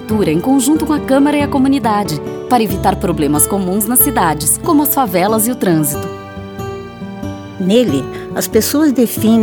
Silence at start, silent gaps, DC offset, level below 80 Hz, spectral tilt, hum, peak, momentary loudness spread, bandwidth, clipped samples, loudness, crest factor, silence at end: 0 s; none; under 0.1%; -36 dBFS; -4.5 dB/octave; none; 0 dBFS; 14 LU; over 20 kHz; under 0.1%; -13 LUFS; 14 dB; 0 s